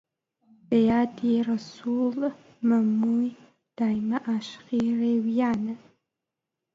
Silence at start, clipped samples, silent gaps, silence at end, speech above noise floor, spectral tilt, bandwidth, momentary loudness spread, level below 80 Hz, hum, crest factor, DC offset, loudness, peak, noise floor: 0.7 s; under 0.1%; none; 1 s; 61 dB; -7.5 dB/octave; 7.4 kHz; 8 LU; -64 dBFS; none; 14 dB; under 0.1%; -26 LUFS; -12 dBFS; -86 dBFS